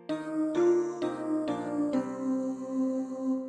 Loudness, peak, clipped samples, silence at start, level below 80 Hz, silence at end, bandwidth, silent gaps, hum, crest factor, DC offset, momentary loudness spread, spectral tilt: -30 LUFS; -16 dBFS; under 0.1%; 0 s; -74 dBFS; 0 s; 9.8 kHz; none; none; 14 dB; under 0.1%; 7 LU; -6.5 dB/octave